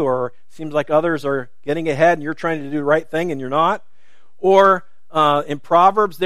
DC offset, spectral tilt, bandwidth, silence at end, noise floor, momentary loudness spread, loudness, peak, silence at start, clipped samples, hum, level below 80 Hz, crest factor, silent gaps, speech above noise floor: 2%; -6 dB/octave; 14 kHz; 0 s; -60 dBFS; 11 LU; -18 LUFS; 0 dBFS; 0 s; under 0.1%; none; -64 dBFS; 18 dB; none; 43 dB